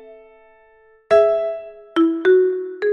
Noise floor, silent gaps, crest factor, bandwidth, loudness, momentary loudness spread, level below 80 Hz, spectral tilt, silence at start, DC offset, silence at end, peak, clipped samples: -53 dBFS; none; 16 dB; 6.8 kHz; -18 LUFS; 10 LU; -62 dBFS; -5.5 dB/octave; 0.1 s; under 0.1%; 0 s; -4 dBFS; under 0.1%